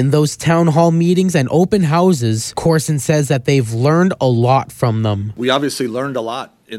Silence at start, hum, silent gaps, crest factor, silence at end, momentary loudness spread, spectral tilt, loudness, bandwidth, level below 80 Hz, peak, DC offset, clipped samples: 0 s; none; none; 14 dB; 0 s; 7 LU; -6 dB/octave; -15 LUFS; 14.5 kHz; -48 dBFS; 0 dBFS; under 0.1%; under 0.1%